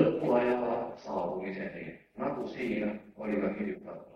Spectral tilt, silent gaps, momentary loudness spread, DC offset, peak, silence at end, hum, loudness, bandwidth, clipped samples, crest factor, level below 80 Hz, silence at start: -8 dB/octave; none; 13 LU; under 0.1%; -10 dBFS; 0.05 s; none; -33 LUFS; 8.2 kHz; under 0.1%; 22 dB; -64 dBFS; 0 s